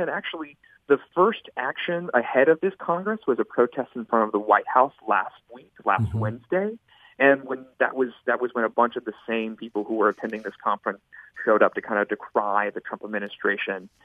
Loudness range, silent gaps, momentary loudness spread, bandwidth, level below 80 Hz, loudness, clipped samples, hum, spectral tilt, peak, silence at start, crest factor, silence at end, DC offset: 3 LU; none; 12 LU; 4.9 kHz; -62 dBFS; -24 LUFS; under 0.1%; none; -8 dB/octave; -4 dBFS; 0 s; 20 dB; 0.2 s; under 0.1%